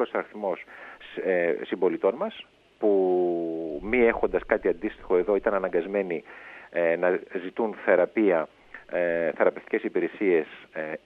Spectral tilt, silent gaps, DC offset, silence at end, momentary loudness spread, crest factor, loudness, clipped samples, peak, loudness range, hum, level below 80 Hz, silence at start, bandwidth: -8 dB/octave; none; under 0.1%; 0.1 s; 12 LU; 20 dB; -26 LUFS; under 0.1%; -6 dBFS; 2 LU; none; -54 dBFS; 0 s; 4.6 kHz